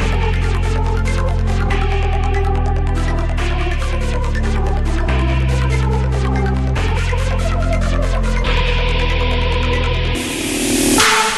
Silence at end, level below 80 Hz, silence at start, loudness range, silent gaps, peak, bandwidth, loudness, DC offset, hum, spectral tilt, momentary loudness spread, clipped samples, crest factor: 0 s; -18 dBFS; 0 s; 2 LU; none; 0 dBFS; 12.5 kHz; -17 LUFS; under 0.1%; none; -4.5 dB/octave; 3 LU; under 0.1%; 16 dB